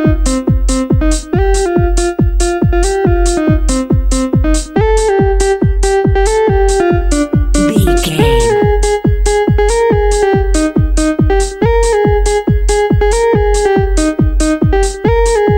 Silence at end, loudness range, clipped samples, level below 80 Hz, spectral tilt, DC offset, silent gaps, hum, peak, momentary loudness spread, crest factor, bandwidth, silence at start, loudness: 0 s; 1 LU; under 0.1%; -14 dBFS; -5.5 dB/octave; under 0.1%; none; none; 0 dBFS; 3 LU; 10 dB; 13.5 kHz; 0 s; -12 LUFS